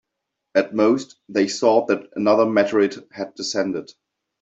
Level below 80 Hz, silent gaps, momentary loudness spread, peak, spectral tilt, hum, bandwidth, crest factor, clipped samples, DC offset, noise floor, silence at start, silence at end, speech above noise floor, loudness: -68 dBFS; none; 10 LU; -4 dBFS; -4.5 dB/octave; none; 8 kHz; 18 dB; under 0.1%; under 0.1%; -80 dBFS; 0.55 s; 0.6 s; 61 dB; -20 LUFS